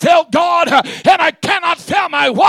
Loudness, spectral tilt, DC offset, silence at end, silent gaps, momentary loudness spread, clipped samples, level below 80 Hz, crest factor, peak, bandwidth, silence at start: -13 LUFS; -3.5 dB/octave; under 0.1%; 0 s; none; 4 LU; under 0.1%; -56 dBFS; 12 dB; -2 dBFS; 14.5 kHz; 0 s